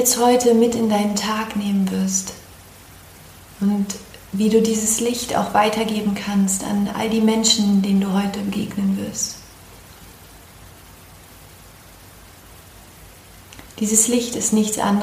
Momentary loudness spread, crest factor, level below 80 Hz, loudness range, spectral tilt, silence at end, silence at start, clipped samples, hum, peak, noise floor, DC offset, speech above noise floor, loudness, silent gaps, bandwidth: 10 LU; 18 dB; -50 dBFS; 9 LU; -4 dB/octave; 0 s; 0 s; under 0.1%; none; -2 dBFS; -44 dBFS; under 0.1%; 25 dB; -19 LUFS; none; 15.5 kHz